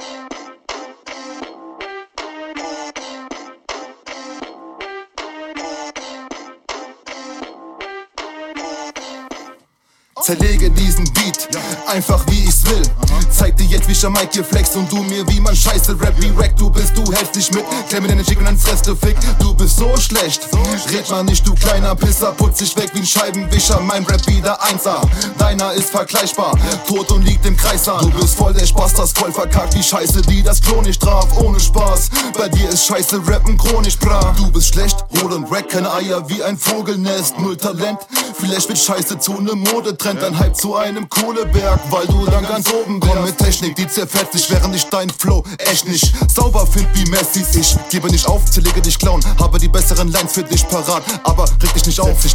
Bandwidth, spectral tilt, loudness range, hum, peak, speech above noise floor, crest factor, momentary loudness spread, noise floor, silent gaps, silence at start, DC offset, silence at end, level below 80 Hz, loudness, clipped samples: 18 kHz; -4 dB/octave; 16 LU; none; 0 dBFS; 46 dB; 14 dB; 17 LU; -59 dBFS; none; 0 s; under 0.1%; 0 s; -16 dBFS; -15 LUFS; under 0.1%